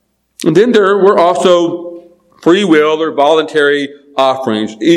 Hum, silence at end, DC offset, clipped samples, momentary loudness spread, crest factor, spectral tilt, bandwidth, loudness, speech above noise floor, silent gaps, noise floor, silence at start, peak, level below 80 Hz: none; 0 s; under 0.1%; 0.6%; 9 LU; 10 dB; -5 dB/octave; 12.5 kHz; -11 LUFS; 26 dB; none; -36 dBFS; 0.4 s; 0 dBFS; -60 dBFS